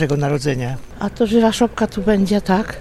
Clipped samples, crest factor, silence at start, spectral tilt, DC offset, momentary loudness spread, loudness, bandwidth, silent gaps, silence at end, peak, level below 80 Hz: under 0.1%; 16 dB; 0 s; -6 dB/octave; under 0.1%; 10 LU; -18 LUFS; 13.5 kHz; none; 0 s; -2 dBFS; -38 dBFS